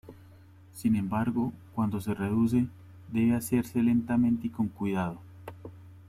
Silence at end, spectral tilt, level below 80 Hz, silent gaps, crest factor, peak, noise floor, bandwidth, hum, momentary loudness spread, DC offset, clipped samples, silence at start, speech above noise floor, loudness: 0.05 s; -7.5 dB/octave; -60 dBFS; none; 16 dB; -14 dBFS; -53 dBFS; 14.5 kHz; none; 19 LU; under 0.1%; under 0.1%; 0.05 s; 26 dB; -29 LUFS